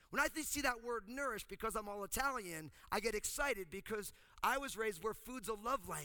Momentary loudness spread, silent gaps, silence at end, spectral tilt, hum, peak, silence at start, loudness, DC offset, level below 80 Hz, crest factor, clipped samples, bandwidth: 7 LU; none; 0 s; -2.5 dB/octave; none; -20 dBFS; 0.1 s; -41 LUFS; under 0.1%; -60 dBFS; 20 dB; under 0.1%; over 20 kHz